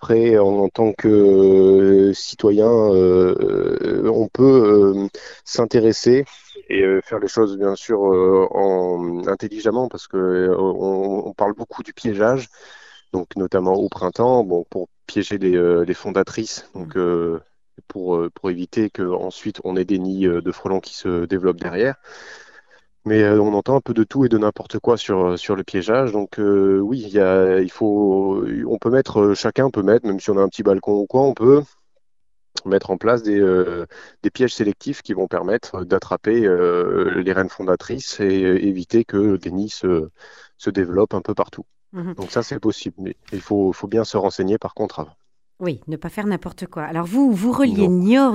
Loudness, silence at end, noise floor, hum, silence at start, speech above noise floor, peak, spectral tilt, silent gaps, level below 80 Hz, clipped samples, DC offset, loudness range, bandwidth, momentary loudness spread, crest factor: -18 LUFS; 0 s; -81 dBFS; none; 0 s; 63 dB; -2 dBFS; -6.5 dB/octave; none; -52 dBFS; under 0.1%; 0.1%; 8 LU; 8.6 kHz; 13 LU; 16 dB